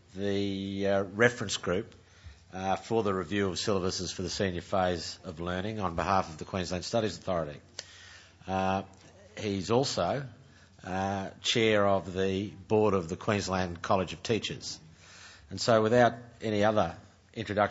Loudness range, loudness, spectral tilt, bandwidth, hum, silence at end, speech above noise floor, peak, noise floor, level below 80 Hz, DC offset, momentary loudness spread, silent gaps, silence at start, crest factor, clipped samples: 4 LU; -30 LUFS; -5 dB/octave; 8 kHz; none; 0 s; 23 dB; -8 dBFS; -53 dBFS; -58 dBFS; under 0.1%; 18 LU; none; 0.15 s; 22 dB; under 0.1%